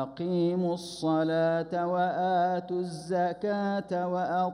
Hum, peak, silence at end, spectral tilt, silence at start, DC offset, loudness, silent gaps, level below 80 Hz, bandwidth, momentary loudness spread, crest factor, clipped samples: none; -18 dBFS; 0 s; -7 dB/octave; 0 s; under 0.1%; -29 LUFS; none; -68 dBFS; 11.5 kHz; 5 LU; 12 dB; under 0.1%